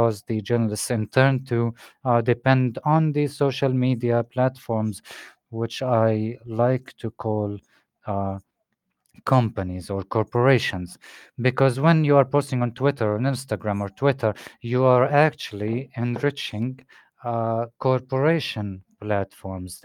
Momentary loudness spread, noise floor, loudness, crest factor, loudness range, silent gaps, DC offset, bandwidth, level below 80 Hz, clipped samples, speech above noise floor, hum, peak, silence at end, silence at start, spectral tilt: 14 LU; -77 dBFS; -23 LUFS; 20 dB; 4 LU; none; under 0.1%; 15.5 kHz; -64 dBFS; under 0.1%; 54 dB; none; -2 dBFS; 0.1 s; 0 s; -7 dB/octave